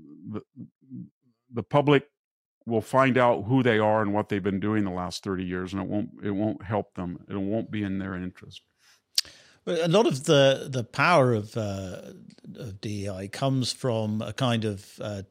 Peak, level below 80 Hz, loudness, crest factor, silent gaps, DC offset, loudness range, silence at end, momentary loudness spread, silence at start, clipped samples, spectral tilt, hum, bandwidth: -6 dBFS; -64 dBFS; -26 LUFS; 20 dB; 0.75-0.81 s, 1.11-1.21 s, 2.17-2.61 s; under 0.1%; 7 LU; 0.05 s; 18 LU; 0.05 s; under 0.1%; -5.5 dB/octave; none; 15.5 kHz